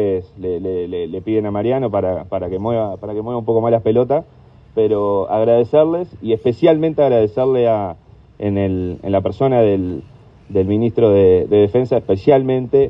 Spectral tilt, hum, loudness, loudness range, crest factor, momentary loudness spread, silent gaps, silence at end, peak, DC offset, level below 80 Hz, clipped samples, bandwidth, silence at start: -10 dB/octave; none; -17 LUFS; 4 LU; 16 dB; 10 LU; none; 0 s; 0 dBFS; under 0.1%; -48 dBFS; under 0.1%; 5.6 kHz; 0 s